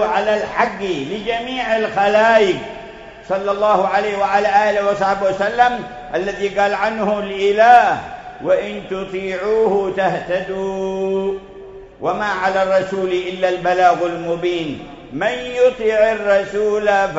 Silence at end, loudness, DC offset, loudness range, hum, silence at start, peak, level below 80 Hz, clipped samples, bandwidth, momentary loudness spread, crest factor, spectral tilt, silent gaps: 0 s; -17 LUFS; under 0.1%; 4 LU; none; 0 s; 0 dBFS; -48 dBFS; under 0.1%; 8 kHz; 11 LU; 18 dB; -5 dB/octave; none